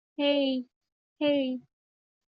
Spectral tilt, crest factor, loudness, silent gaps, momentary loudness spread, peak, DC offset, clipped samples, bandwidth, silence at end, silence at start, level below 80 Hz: -1.5 dB/octave; 16 dB; -28 LUFS; 0.76-0.81 s, 0.92-1.16 s; 12 LU; -16 dBFS; under 0.1%; under 0.1%; 5.4 kHz; 0.7 s; 0.2 s; -80 dBFS